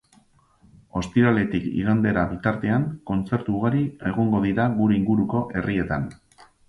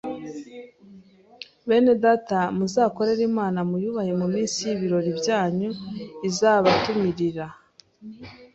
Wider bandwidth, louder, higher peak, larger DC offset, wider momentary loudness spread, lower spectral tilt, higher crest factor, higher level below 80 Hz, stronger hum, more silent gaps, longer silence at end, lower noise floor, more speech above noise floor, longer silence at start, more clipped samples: about the same, 7.8 kHz vs 8.2 kHz; about the same, -23 LUFS vs -23 LUFS; about the same, -6 dBFS vs -4 dBFS; neither; second, 7 LU vs 20 LU; first, -8.5 dB/octave vs -5.5 dB/octave; about the same, 18 dB vs 20 dB; first, -46 dBFS vs -60 dBFS; neither; neither; first, 0.55 s vs 0.1 s; first, -58 dBFS vs -50 dBFS; first, 36 dB vs 27 dB; first, 0.95 s vs 0.05 s; neither